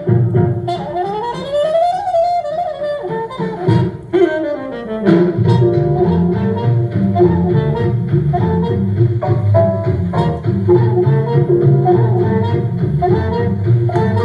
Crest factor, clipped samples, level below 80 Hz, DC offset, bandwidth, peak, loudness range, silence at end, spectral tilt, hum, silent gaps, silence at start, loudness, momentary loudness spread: 14 dB; under 0.1%; -40 dBFS; under 0.1%; 5.4 kHz; 0 dBFS; 3 LU; 0 s; -9.5 dB/octave; none; none; 0 s; -15 LUFS; 8 LU